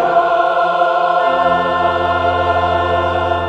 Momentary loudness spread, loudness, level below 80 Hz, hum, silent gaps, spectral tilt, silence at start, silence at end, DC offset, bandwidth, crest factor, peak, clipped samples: 2 LU; -14 LUFS; -40 dBFS; none; none; -6.5 dB/octave; 0 s; 0 s; under 0.1%; 8.2 kHz; 12 dB; -2 dBFS; under 0.1%